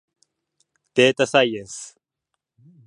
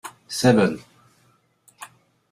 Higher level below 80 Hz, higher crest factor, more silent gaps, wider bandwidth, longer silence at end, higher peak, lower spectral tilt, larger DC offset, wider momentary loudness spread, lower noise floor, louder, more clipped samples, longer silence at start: second, -70 dBFS vs -60 dBFS; about the same, 22 dB vs 22 dB; neither; second, 11 kHz vs 15 kHz; first, 1 s vs 0.45 s; about the same, -2 dBFS vs -4 dBFS; second, -3.5 dB/octave vs -5.5 dB/octave; neither; second, 19 LU vs 25 LU; first, -81 dBFS vs -62 dBFS; about the same, -19 LUFS vs -20 LUFS; neither; first, 0.95 s vs 0.05 s